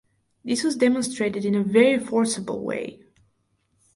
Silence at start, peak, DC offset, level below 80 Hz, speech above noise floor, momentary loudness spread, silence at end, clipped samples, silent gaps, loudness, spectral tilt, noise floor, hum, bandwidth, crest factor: 0.45 s; -4 dBFS; under 0.1%; -66 dBFS; 47 dB; 12 LU; 1 s; under 0.1%; none; -23 LUFS; -4.5 dB/octave; -69 dBFS; none; 11.5 kHz; 20 dB